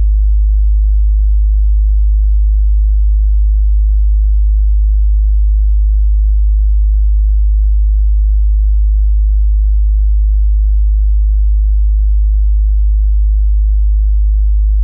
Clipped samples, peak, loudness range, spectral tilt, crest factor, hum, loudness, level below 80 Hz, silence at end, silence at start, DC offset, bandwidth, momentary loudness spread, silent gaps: under 0.1%; -6 dBFS; 0 LU; -26.5 dB/octave; 4 dB; none; -13 LUFS; -8 dBFS; 0 s; 0 s; under 0.1%; 0.2 kHz; 0 LU; none